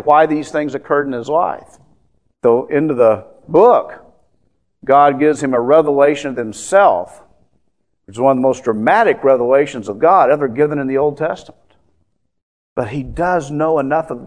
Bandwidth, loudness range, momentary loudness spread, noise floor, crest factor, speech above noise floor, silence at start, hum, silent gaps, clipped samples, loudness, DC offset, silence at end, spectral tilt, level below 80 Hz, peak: 10.5 kHz; 4 LU; 11 LU; -67 dBFS; 16 dB; 53 dB; 0.05 s; none; 12.42-12.76 s; under 0.1%; -14 LUFS; 0.2%; 0 s; -6 dB/octave; -48 dBFS; 0 dBFS